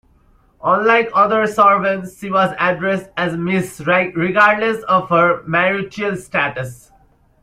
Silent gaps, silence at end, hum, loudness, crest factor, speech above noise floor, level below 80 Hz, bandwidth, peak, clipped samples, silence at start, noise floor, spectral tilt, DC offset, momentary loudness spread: none; 0.65 s; none; -16 LUFS; 16 dB; 37 dB; -54 dBFS; 15.5 kHz; -2 dBFS; under 0.1%; 0.65 s; -53 dBFS; -6 dB/octave; under 0.1%; 9 LU